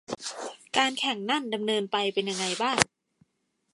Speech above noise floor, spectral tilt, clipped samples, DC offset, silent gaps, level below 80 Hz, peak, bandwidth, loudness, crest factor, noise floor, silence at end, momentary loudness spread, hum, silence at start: 48 dB; -2.5 dB/octave; under 0.1%; under 0.1%; none; -64 dBFS; 0 dBFS; 12 kHz; -27 LUFS; 30 dB; -76 dBFS; 0.9 s; 10 LU; none; 0.1 s